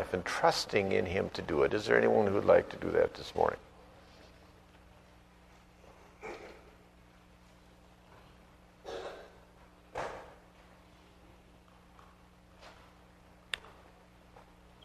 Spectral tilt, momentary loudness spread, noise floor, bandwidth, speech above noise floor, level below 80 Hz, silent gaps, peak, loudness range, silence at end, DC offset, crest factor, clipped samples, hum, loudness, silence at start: -5 dB/octave; 25 LU; -60 dBFS; 13.5 kHz; 30 dB; -60 dBFS; none; -10 dBFS; 24 LU; 0.45 s; under 0.1%; 26 dB; under 0.1%; 60 Hz at -65 dBFS; -31 LUFS; 0 s